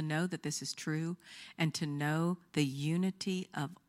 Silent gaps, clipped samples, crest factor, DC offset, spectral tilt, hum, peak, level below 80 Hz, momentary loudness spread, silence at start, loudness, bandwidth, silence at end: none; under 0.1%; 18 dB; under 0.1%; -5 dB/octave; none; -16 dBFS; -78 dBFS; 6 LU; 0 s; -36 LUFS; 15.5 kHz; 0.15 s